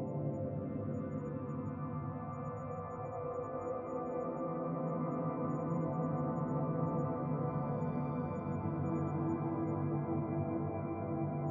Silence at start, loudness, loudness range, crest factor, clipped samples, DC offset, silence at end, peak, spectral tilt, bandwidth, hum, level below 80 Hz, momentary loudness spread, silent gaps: 0 s; -38 LUFS; 4 LU; 14 dB; under 0.1%; under 0.1%; 0 s; -22 dBFS; -11.5 dB/octave; 7 kHz; none; -66 dBFS; 5 LU; none